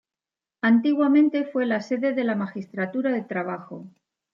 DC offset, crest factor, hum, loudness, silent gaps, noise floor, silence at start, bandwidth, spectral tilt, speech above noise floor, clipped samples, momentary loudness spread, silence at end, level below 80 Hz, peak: under 0.1%; 14 dB; none; -23 LUFS; none; under -90 dBFS; 0.65 s; 7 kHz; -7.5 dB/octave; over 67 dB; under 0.1%; 13 LU; 0.45 s; -78 dBFS; -10 dBFS